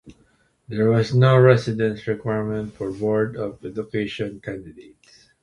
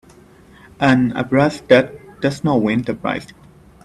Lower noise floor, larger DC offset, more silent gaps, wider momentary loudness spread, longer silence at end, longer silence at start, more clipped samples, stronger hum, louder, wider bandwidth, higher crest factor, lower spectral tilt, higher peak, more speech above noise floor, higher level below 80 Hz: first, -61 dBFS vs -46 dBFS; neither; neither; first, 17 LU vs 9 LU; about the same, 0.6 s vs 0.6 s; second, 0.05 s vs 0.8 s; neither; neither; second, -21 LUFS vs -17 LUFS; second, 9.8 kHz vs 12 kHz; about the same, 20 dB vs 18 dB; about the same, -8 dB/octave vs -7 dB/octave; about the same, -2 dBFS vs 0 dBFS; first, 40 dB vs 30 dB; about the same, -54 dBFS vs -50 dBFS